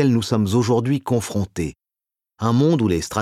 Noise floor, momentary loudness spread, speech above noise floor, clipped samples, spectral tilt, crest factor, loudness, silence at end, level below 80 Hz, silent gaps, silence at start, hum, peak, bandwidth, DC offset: -89 dBFS; 9 LU; 70 dB; under 0.1%; -6.5 dB/octave; 16 dB; -20 LUFS; 0 s; -46 dBFS; none; 0 s; none; -4 dBFS; 14.5 kHz; under 0.1%